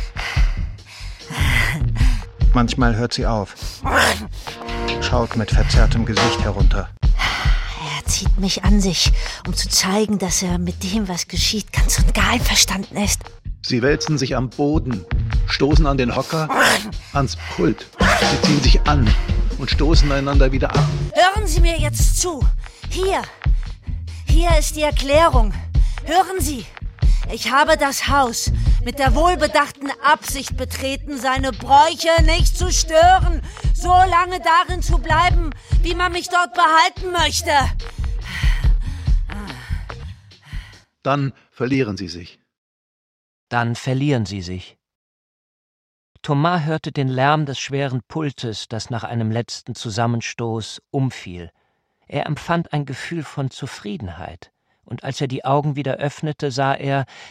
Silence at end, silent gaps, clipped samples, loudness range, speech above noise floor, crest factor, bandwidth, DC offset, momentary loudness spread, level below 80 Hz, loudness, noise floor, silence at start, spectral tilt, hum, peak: 0 s; 42.58-43.47 s, 44.95-46.15 s; under 0.1%; 9 LU; 49 dB; 16 dB; 16 kHz; under 0.1%; 14 LU; -22 dBFS; -19 LUFS; -66 dBFS; 0 s; -4.5 dB/octave; none; -2 dBFS